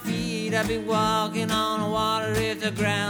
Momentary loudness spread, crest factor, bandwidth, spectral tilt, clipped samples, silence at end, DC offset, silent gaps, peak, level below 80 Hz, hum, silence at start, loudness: 3 LU; 16 dB; over 20 kHz; -4.5 dB/octave; under 0.1%; 0 s; under 0.1%; none; -10 dBFS; -48 dBFS; none; 0 s; -25 LUFS